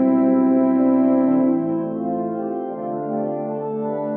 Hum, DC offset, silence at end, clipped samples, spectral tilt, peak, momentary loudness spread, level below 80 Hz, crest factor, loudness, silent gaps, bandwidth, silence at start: none; under 0.1%; 0 s; under 0.1%; -10.5 dB/octave; -8 dBFS; 9 LU; -66 dBFS; 12 dB; -20 LUFS; none; 2.7 kHz; 0 s